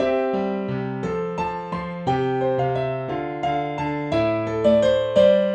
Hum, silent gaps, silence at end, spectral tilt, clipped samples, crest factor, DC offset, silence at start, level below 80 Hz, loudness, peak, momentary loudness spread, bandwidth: none; none; 0 s; -7.5 dB/octave; under 0.1%; 16 dB; under 0.1%; 0 s; -48 dBFS; -22 LUFS; -4 dBFS; 10 LU; 8.6 kHz